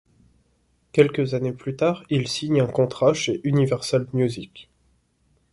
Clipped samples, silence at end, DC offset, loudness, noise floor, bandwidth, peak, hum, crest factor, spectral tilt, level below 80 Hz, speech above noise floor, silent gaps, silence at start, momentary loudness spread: under 0.1%; 0.9 s; under 0.1%; -22 LUFS; -65 dBFS; 11.5 kHz; -2 dBFS; none; 20 dB; -6 dB/octave; -58 dBFS; 43 dB; none; 0.95 s; 6 LU